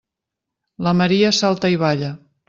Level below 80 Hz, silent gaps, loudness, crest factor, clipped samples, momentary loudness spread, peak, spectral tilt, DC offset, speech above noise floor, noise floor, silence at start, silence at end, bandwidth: -56 dBFS; none; -17 LUFS; 16 dB; under 0.1%; 9 LU; -4 dBFS; -5.5 dB/octave; under 0.1%; 66 dB; -83 dBFS; 0.8 s; 0.3 s; 7.6 kHz